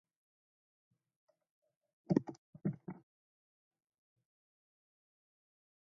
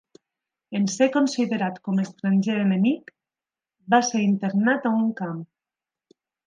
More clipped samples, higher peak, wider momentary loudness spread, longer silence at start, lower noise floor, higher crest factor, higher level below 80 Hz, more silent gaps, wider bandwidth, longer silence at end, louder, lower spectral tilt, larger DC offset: neither; second, -16 dBFS vs -6 dBFS; first, 17 LU vs 9 LU; first, 2.1 s vs 0.7 s; about the same, under -90 dBFS vs under -90 dBFS; first, 30 dB vs 18 dB; about the same, -80 dBFS vs -76 dBFS; first, 2.38-2.53 s vs none; second, 6.2 kHz vs 9.4 kHz; first, 2.95 s vs 1.05 s; second, -39 LUFS vs -23 LUFS; first, -10 dB/octave vs -5.5 dB/octave; neither